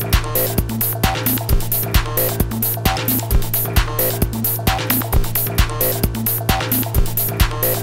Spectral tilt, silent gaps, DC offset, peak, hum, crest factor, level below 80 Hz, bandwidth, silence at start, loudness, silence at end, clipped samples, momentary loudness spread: -4.5 dB/octave; none; 0.7%; 0 dBFS; none; 16 dB; -22 dBFS; 17 kHz; 0 s; -18 LUFS; 0 s; under 0.1%; 2 LU